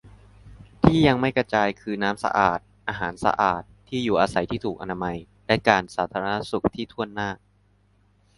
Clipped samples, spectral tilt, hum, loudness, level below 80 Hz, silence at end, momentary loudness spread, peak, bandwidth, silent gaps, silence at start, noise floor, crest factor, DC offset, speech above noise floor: under 0.1%; -6 dB/octave; 50 Hz at -50 dBFS; -24 LUFS; -46 dBFS; 1 s; 11 LU; 0 dBFS; 11.5 kHz; none; 0.05 s; -61 dBFS; 24 dB; under 0.1%; 38 dB